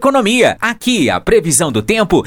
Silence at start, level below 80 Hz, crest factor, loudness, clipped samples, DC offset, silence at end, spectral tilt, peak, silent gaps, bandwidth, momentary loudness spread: 0 s; -36 dBFS; 12 dB; -12 LUFS; under 0.1%; under 0.1%; 0 s; -3.5 dB/octave; 0 dBFS; none; over 20 kHz; 3 LU